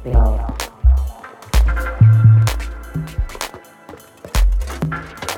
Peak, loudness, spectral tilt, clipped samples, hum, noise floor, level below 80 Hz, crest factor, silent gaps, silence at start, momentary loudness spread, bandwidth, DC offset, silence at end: -2 dBFS; -17 LUFS; -6 dB/octave; under 0.1%; none; -40 dBFS; -20 dBFS; 14 dB; none; 0 s; 17 LU; 17 kHz; under 0.1%; 0 s